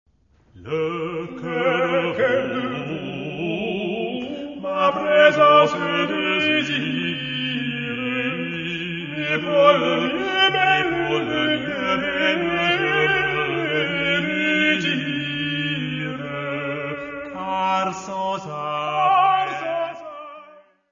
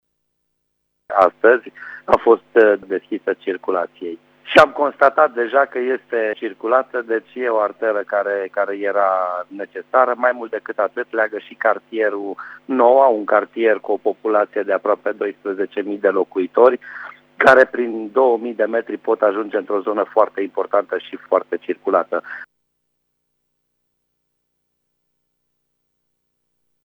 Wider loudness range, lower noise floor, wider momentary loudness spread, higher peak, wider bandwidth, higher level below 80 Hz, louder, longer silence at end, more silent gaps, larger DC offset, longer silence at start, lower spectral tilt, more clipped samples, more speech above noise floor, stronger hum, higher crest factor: about the same, 6 LU vs 4 LU; second, -56 dBFS vs -73 dBFS; about the same, 12 LU vs 12 LU; about the same, -2 dBFS vs 0 dBFS; second, 7.4 kHz vs 9.6 kHz; about the same, -56 dBFS vs -60 dBFS; second, -21 LUFS vs -18 LUFS; second, 0.3 s vs 4.4 s; neither; neither; second, 0.55 s vs 1.1 s; about the same, -5 dB/octave vs -5.5 dB/octave; neither; second, 37 dB vs 55 dB; second, none vs 60 Hz at -60 dBFS; about the same, 20 dB vs 18 dB